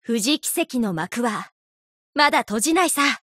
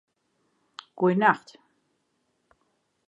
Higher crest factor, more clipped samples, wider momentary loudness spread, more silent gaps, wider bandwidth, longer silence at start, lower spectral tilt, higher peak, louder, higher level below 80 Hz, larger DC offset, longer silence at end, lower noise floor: second, 18 dB vs 24 dB; neither; second, 9 LU vs 25 LU; first, 1.52-2.13 s vs none; first, 16 kHz vs 8 kHz; second, 0.1 s vs 0.95 s; second, -2.5 dB/octave vs -7.5 dB/octave; about the same, -4 dBFS vs -6 dBFS; first, -21 LUFS vs -24 LUFS; first, -62 dBFS vs -80 dBFS; neither; second, 0.1 s vs 1.7 s; first, under -90 dBFS vs -74 dBFS